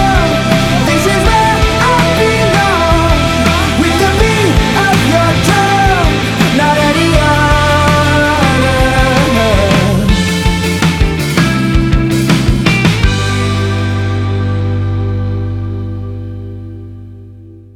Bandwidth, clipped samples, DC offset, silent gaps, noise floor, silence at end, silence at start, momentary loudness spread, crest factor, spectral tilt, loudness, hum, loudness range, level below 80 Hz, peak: 17.5 kHz; under 0.1%; under 0.1%; none; -33 dBFS; 0.15 s; 0 s; 8 LU; 10 dB; -5 dB/octave; -11 LUFS; 50 Hz at -35 dBFS; 6 LU; -20 dBFS; 0 dBFS